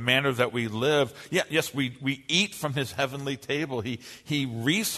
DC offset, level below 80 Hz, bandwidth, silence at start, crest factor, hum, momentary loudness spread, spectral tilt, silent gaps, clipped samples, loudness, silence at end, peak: under 0.1%; -64 dBFS; 13.5 kHz; 0 s; 22 dB; none; 7 LU; -4 dB/octave; none; under 0.1%; -27 LUFS; 0 s; -6 dBFS